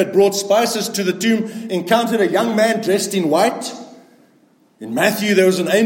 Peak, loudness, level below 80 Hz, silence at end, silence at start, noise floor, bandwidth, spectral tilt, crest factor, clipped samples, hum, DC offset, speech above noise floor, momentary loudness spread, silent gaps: -2 dBFS; -17 LUFS; -68 dBFS; 0 s; 0 s; -55 dBFS; 17 kHz; -4 dB/octave; 16 dB; under 0.1%; none; under 0.1%; 38 dB; 10 LU; none